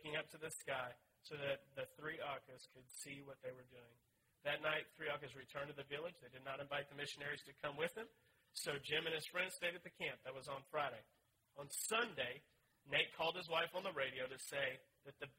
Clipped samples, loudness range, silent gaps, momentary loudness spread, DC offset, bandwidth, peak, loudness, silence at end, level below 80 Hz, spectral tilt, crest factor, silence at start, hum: under 0.1%; 6 LU; none; 15 LU; under 0.1%; 16 kHz; -22 dBFS; -45 LUFS; 0.05 s; -82 dBFS; -2.5 dB/octave; 24 dB; 0 s; none